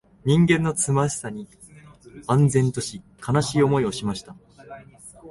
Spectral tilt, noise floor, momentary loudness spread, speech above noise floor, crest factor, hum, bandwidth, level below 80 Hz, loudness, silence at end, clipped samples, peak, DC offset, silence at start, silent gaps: -5.5 dB/octave; -47 dBFS; 24 LU; 26 dB; 18 dB; none; 11.5 kHz; -52 dBFS; -22 LUFS; 0 s; under 0.1%; -6 dBFS; under 0.1%; 0.25 s; none